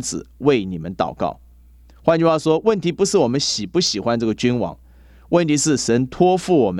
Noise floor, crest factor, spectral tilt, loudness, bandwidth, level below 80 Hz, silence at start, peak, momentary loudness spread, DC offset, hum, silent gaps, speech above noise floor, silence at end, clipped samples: -47 dBFS; 18 dB; -4.5 dB/octave; -19 LUFS; 13 kHz; -48 dBFS; 0 s; -2 dBFS; 8 LU; under 0.1%; none; none; 29 dB; 0 s; under 0.1%